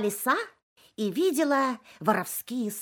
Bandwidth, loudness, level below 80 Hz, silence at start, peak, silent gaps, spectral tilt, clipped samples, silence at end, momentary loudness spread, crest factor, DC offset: 17.5 kHz; -27 LUFS; -78 dBFS; 0 s; -8 dBFS; 0.62-0.76 s; -4 dB/octave; under 0.1%; 0 s; 8 LU; 20 dB; under 0.1%